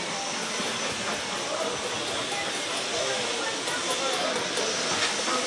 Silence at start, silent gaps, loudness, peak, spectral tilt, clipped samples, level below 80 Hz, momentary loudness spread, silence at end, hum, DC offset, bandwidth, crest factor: 0 s; none; -27 LUFS; -12 dBFS; -1 dB/octave; under 0.1%; -66 dBFS; 4 LU; 0 s; none; under 0.1%; 12 kHz; 16 dB